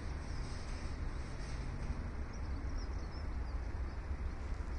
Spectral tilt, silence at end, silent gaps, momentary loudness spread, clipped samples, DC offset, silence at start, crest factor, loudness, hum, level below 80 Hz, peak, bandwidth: -6 dB/octave; 0 s; none; 2 LU; under 0.1%; under 0.1%; 0 s; 14 dB; -44 LUFS; none; -42 dBFS; -26 dBFS; 10.5 kHz